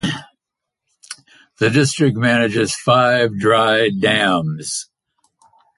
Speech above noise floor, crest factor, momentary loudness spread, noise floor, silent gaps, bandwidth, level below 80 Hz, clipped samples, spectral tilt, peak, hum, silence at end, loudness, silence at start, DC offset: 66 dB; 18 dB; 16 LU; -82 dBFS; none; 11.5 kHz; -54 dBFS; under 0.1%; -4.5 dB/octave; 0 dBFS; none; 0.95 s; -16 LUFS; 0.05 s; under 0.1%